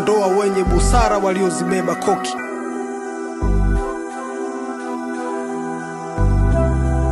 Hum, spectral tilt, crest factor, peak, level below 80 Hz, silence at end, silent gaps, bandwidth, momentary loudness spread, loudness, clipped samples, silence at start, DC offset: none; -6 dB/octave; 16 dB; -2 dBFS; -24 dBFS; 0 s; none; 12 kHz; 11 LU; -20 LUFS; under 0.1%; 0 s; under 0.1%